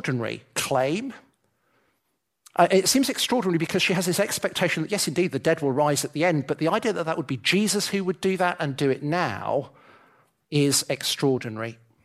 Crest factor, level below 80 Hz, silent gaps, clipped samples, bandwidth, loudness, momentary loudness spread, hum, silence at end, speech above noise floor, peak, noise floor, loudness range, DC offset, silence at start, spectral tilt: 20 dB; -66 dBFS; none; under 0.1%; 15.5 kHz; -24 LUFS; 7 LU; none; 0.3 s; 52 dB; -4 dBFS; -76 dBFS; 3 LU; under 0.1%; 0.05 s; -4 dB/octave